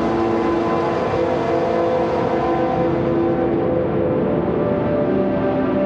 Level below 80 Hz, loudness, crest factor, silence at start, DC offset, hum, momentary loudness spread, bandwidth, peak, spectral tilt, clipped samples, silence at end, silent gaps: -40 dBFS; -19 LUFS; 10 dB; 0 s; under 0.1%; none; 1 LU; 7.6 kHz; -8 dBFS; -8.5 dB/octave; under 0.1%; 0 s; none